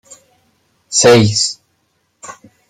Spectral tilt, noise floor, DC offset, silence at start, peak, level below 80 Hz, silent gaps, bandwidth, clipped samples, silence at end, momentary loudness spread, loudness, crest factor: -3.5 dB/octave; -63 dBFS; under 0.1%; 0.9 s; 0 dBFS; -52 dBFS; none; 15 kHz; under 0.1%; 0.4 s; 26 LU; -11 LUFS; 16 dB